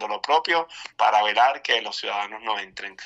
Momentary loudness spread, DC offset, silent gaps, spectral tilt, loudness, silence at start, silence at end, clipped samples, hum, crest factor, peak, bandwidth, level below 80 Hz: 10 LU; under 0.1%; none; -0.5 dB/octave; -22 LUFS; 0 s; 0 s; under 0.1%; none; 18 dB; -6 dBFS; 9.8 kHz; -72 dBFS